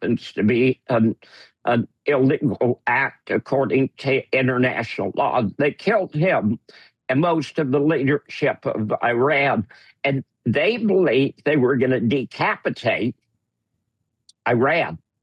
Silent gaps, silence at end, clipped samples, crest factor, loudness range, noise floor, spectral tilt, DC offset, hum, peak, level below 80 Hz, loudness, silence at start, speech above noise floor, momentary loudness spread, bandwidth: none; 0.25 s; under 0.1%; 12 dB; 2 LU; -76 dBFS; -7.5 dB/octave; under 0.1%; none; -10 dBFS; -66 dBFS; -21 LUFS; 0 s; 56 dB; 7 LU; 9.4 kHz